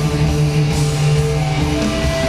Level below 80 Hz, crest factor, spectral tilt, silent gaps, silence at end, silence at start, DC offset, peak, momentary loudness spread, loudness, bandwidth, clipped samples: -26 dBFS; 12 dB; -6 dB/octave; none; 0 s; 0 s; under 0.1%; -4 dBFS; 2 LU; -16 LUFS; 13.5 kHz; under 0.1%